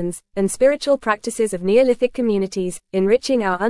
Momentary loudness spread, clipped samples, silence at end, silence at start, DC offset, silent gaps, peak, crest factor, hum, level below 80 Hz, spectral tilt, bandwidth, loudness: 8 LU; under 0.1%; 0 s; 0 s; under 0.1%; none; -4 dBFS; 16 dB; none; -50 dBFS; -5 dB/octave; 12 kHz; -19 LUFS